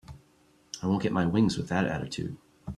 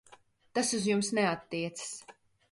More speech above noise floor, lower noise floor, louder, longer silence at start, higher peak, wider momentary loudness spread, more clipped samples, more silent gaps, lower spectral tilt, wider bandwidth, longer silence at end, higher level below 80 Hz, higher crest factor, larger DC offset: first, 35 dB vs 29 dB; about the same, -63 dBFS vs -61 dBFS; first, -29 LUFS vs -32 LUFS; about the same, 0.1 s vs 0.1 s; first, -12 dBFS vs -16 dBFS; about the same, 14 LU vs 12 LU; neither; neither; first, -6 dB/octave vs -3.5 dB/octave; about the same, 12 kHz vs 11.5 kHz; second, 0 s vs 0.4 s; first, -56 dBFS vs -72 dBFS; about the same, 18 dB vs 18 dB; neither